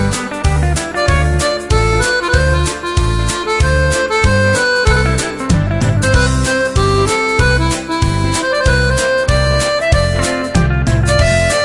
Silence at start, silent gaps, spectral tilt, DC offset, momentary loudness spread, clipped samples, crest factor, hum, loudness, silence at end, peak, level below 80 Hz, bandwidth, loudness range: 0 s; none; -4.5 dB/octave; under 0.1%; 4 LU; under 0.1%; 12 dB; none; -13 LUFS; 0 s; 0 dBFS; -20 dBFS; 11.5 kHz; 1 LU